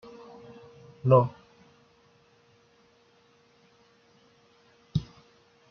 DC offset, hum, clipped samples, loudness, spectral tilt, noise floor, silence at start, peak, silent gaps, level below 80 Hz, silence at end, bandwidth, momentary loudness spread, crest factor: under 0.1%; none; under 0.1%; -26 LUFS; -8.5 dB/octave; -63 dBFS; 1.05 s; -8 dBFS; none; -60 dBFS; 0.7 s; 6.4 kHz; 29 LU; 26 dB